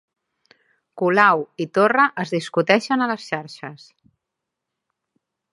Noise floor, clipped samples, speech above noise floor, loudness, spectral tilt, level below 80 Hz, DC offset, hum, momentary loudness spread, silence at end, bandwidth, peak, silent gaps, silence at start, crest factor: -82 dBFS; under 0.1%; 63 dB; -19 LUFS; -5.5 dB/octave; -74 dBFS; under 0.1%; none; 14 LU; 1.75 s; 11.5 kHz; 0 dBFS; none; 0.95 s; 22 dB